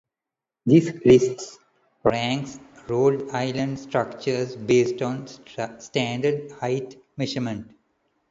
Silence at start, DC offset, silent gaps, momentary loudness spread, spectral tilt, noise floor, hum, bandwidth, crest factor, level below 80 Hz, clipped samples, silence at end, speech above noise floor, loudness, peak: 0.65 s; under 0.1%; none; 16 LU; -6 dB/octave; -88 dBFS; none; 7.8 kHz; 20 dB; -58 dBFS; under 0.1%; 0.65 s; 65 dB; -23 LUFS; -4 dBFS